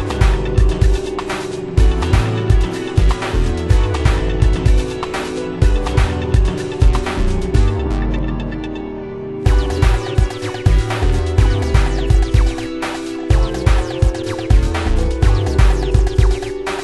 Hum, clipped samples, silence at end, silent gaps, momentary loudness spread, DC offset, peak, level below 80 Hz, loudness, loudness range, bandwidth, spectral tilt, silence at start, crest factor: none; under 0.1%; 0 s; none; 7 LU; under 0.1%; 0 dBFS; -16 dBFS; -17 LUFS; 2 LU; 11.5 kHz; -6.5 dB/octave; 0 s; 14 dB